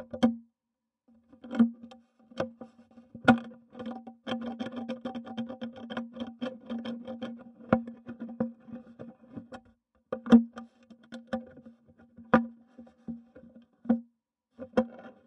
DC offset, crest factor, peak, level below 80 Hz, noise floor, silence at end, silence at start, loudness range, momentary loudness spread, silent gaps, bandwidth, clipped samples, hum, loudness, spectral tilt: under 0.1%; 28 dB; -4 dBFS; -66 dBFS; -87 dBFS; 0.15 s; 0 s; 8 LU; 23 LU; none; 8.2 kHz; under 0.1%; none; -31 LUFS; -7 dB/octave